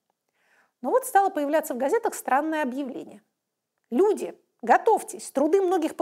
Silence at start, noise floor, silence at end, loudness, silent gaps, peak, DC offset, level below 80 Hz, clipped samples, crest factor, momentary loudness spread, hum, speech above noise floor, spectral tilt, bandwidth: 0.85 s; -81 dBFS; 0 s; -24 LUFS; none; -6 dBFS; under 0.1%; -78 dBFS; under 0.1%; 18 dB; 13 LU; none; 57 dB; -3.5 dB/octave; 16 kHz